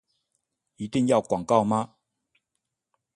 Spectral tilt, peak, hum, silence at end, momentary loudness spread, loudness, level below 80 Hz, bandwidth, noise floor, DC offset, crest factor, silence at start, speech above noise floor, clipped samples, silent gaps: -6.5 dB/octave; -8 dBFS; none; 1.3 s; 13 LU; -24 LUFS; -62 dBFS; 11.5 kHz; -82 dBFS; under 0.1%; 20 dB; 0.8 s; 59 dB; under 0.1%; none